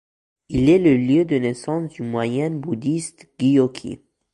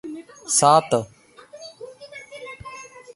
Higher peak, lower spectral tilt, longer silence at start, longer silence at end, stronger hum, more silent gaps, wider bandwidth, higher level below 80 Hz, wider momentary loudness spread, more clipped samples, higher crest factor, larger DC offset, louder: second, -6 dBFS vs -2 dBFS; first, -7 dB/octave vs -3 dB/octave; first, 0.5 s vs 0.05 s; about the same, 0.4 s vs 0.3 s; neither; neither; about the same, 11.5 kHz vs 11.5 kHz; first, -46 dBFS vs -62 dBFS; second, 13 LU vs 25 LU; neither; second, 16 dB vs 22 dB; neither; about the same, -20 LUFS vs -18 LUFS